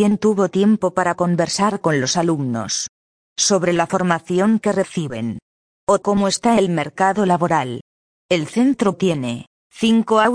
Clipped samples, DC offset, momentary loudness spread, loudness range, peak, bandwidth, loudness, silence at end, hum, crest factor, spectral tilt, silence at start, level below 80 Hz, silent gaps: under 0.1%; under 0.1%; 10 LU; 1 LU; -2 dBFS; 10.5 kHz; -18 LUFS; 0 s; none; 18 dB; -4.5 dB/octave; 0 s; -56 dBFS; 2.89-3.36 s, 5.42-5.87 s, 7.81-8.29 s, 9.47-9.70 s